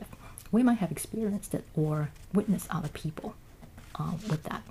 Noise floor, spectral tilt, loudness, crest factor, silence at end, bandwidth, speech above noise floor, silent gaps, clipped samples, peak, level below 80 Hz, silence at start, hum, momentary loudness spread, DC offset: -49 dBFS; -6.5 dB/octave; -31 LUFS; 16 dB; 0 s; 15.5 kHz; 19 dB; none; under 0.1%; -14 dBFS; -52 dBFS; 0 s; none; 18 LU; under 0.1%